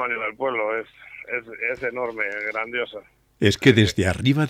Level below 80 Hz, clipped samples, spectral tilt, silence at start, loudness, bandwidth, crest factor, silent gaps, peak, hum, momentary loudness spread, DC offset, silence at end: -50 dBFS; under 0.1%; -5.5 dB/octave; 0 s; -23 LUFS; 15 kHz; 20 dB; none; -4 dBFS; none; 14 LU; under 0.1%; 0 s